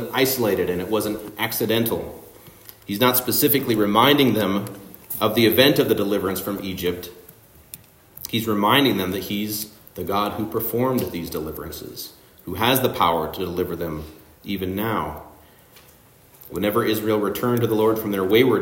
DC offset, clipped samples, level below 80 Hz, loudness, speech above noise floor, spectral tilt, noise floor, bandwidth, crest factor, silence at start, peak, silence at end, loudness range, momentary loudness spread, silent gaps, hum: under 0.1%; under 0.1%; -54 dBFS; -21 LUFS; 30 dB; -4.5 dB/octave; -51 dBFS; 16.5 kHz; 20 dB; 0 s; -2 dBFS; 0 s; 7 LU; 18 LU; none; none